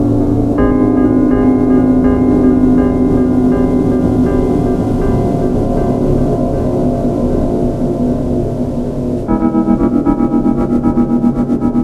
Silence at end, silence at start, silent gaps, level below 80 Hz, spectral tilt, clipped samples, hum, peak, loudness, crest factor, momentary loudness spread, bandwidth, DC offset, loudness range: 0 s; 0 s; none; -22 dBFS; -10 dB/octave; under 0.1%; none; 0 dBFS; -13 LUFS; 12 dB; 5 LU; 8.2 kHz; under 0.1%; 4 LU